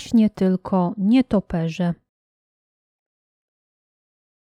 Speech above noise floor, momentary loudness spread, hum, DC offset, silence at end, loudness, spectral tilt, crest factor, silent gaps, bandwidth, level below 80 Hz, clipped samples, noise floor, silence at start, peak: over 71 dB; 8 LU; none; under 0.1%; 2.65 s; -21 LUFS; -8 dB/octave; 16 dB; none; 9.8 kHz; -52 dBFS; under 0.1%; under -90 dBFS; 0 s; -6 dBFS